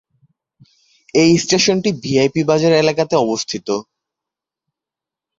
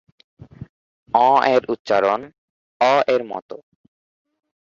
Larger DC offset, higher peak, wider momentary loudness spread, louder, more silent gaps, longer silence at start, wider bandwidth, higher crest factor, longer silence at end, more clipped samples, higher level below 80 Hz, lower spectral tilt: neither; about the same, 0 dBFS vs -2 dBFS; second, 9 LU vs 17 LU; about the same, -16 LUFS vs -18 LUFS; second, none vs 0.69-1.06 s, 1.79-1.85 s, 2.38-2.80 s, 3.42-3.49 s; first, 1.15 s vs 0.6 s; about the same, 7.8 kHz vs 7.6 kHz; about the same, 16 dB vs 20 dB; first, 1.55 s vs 1.1 s; neither; first, -54 dBFS vs -62 dBFS; about the same, -4.5 dB/octave vs -5 dB/octave